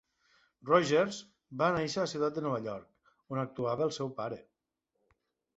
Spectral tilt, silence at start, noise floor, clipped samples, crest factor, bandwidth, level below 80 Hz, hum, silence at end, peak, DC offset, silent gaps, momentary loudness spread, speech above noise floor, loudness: -5.5 dB/octave; 0.65 s; -84 dBFS; under 0.1%; 22 dB; 8.2 kHz; -70 dBFS; none; 1.15 s; -12 dBFS; under 0.1%; none; 17 LU; 52 dB; -32 LUFS